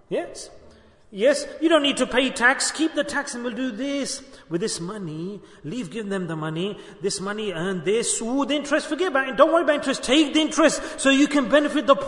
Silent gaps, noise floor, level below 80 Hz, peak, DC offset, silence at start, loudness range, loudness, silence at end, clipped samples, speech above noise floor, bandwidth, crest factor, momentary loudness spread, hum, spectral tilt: none; -50 dBFS; -56 dBFS; -2 dBFS; under 0.1%; 0.1 s; 9 LU; -22 LUFS; 0 s; under 0.1%; 28 dB; 11 kHz; 22 dB; 13 LU; none; -3.5 dB/octave